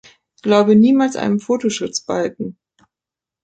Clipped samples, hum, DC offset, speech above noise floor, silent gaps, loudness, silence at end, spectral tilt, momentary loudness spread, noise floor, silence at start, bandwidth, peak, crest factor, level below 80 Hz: under 0.1%; none; under 0.1%; 72 dB; none; -16 LUFS; 0.95 s; -5.5 dB/octave; 14 LU; -88 dBFS; 0.45 s; 9 kHz; -2 dBFS; 16 dB; -60 dBFS